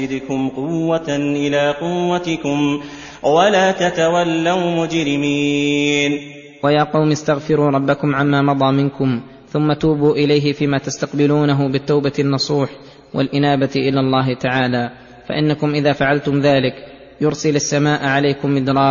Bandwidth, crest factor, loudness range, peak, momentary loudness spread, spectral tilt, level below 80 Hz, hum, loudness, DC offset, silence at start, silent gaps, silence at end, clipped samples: 7.4 kHz; 16 dB; 2 LU; 0 dBFS; 7 LU; -6 dB/octave; -50 dBFS; none; -17 LUFS; under 0.1%; 0 s; none; 0 s; under 0.1%